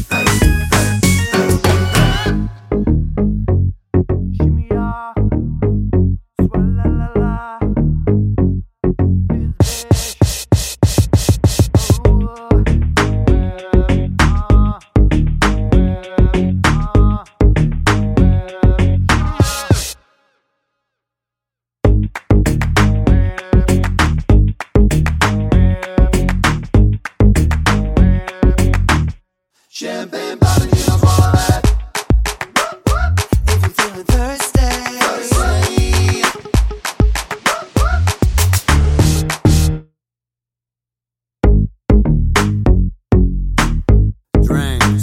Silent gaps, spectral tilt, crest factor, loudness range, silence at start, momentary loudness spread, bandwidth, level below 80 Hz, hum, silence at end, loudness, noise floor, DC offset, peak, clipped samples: none; -5.5 dB/octave; 14 dB; 3 LU; 0 s; 5 LU; 16.5 kHz; -18 dBFS; none; 0 s; -15 LUFS; -87 dBFS; under 0.1%; 0 dBFS; under 0.1%